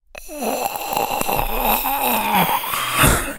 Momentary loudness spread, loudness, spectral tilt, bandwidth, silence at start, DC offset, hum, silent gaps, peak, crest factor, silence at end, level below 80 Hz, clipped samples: 8 LU; -19 LUFS; -3 dB/octave; 17.5 kHz; 0.15 s; under 0.1%; none; none; 0 dBFS; 20 dB; 0 s; -32 dBFS; under 0.1%